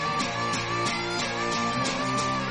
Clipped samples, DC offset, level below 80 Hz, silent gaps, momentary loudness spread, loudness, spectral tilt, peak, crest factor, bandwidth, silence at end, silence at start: under 0.1%; under 0.1%; -52 dBFS; none; 1 LU; -27 LUFS; -3.5 dB/octave; -14 dBFS; 14 dB; 11 kHz; 0 s; 0 s